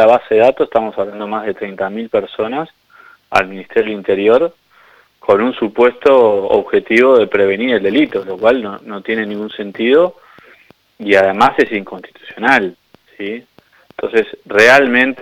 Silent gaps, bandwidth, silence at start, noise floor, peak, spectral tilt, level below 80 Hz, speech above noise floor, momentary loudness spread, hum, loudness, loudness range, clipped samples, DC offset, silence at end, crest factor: none; 13.5 kHz; 0 s; -48 dBFS; 0 dBFS; -5 dB/octave; -54 dBFS; 35 dB; 15 LU; none; -13 LUFS; 5 LU; under 0.1%; under 0.1%; 0 s; 14 dB